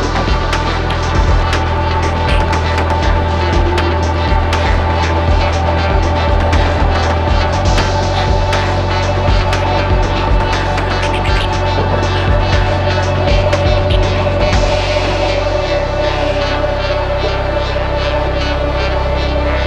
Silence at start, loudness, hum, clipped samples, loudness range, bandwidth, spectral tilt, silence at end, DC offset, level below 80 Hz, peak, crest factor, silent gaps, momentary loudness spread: 0 s; -14 LUFS; none; under 0.1%; 2 LU; 9.6 kHz; -6 dB/octave; 0 s; under 0.1%; -18 dBFS; 0 dBFS; 12 dB; none; 3 LU